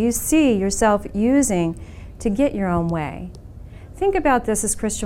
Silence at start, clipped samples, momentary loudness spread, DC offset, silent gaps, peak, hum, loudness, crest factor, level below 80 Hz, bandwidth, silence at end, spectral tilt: 0 s; under 0.1%; 20 LU; under 0.1%; none; -6 dBFS; none; -20 LUFS; 14 dB; -36 dBFS; 16.5 kHz; 0 s; -5 dB/octave